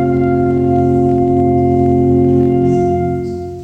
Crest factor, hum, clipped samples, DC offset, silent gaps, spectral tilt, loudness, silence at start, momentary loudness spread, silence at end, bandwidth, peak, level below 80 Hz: 10 dB; none; under 0.1%; under 0.1%; none; -10.5 dB/octave; -13 LUFS; 0 s; 5 LU; 0 s; 6.4 kHz; -2 dBFS; -36 dBFS